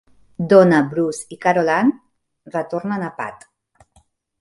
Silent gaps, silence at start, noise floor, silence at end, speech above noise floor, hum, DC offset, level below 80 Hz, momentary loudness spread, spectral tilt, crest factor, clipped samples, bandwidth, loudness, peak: none; 0.4 s; -59 dBFS; 1.05 s; 42 dB; none; under 0.1%; -62 dBFS; 17 LU; -6.5 dB/octave; 18 dB; under 0.1%; 11.5 kHz; -18 LUFS; 0 dBFS